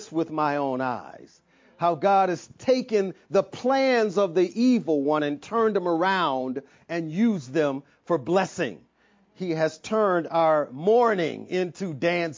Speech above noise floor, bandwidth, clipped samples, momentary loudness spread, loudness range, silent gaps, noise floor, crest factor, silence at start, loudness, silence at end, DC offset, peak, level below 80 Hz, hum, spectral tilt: 38 dB; 7.6 kHz; under 0.1%; 9 LU; 4 LU; none; -62 dBFS; 16 dB; 0 s; -24 LUFS; 0 s; under 0.1%; -8 dBFS; -72 dBFS; none; -6 dB/octave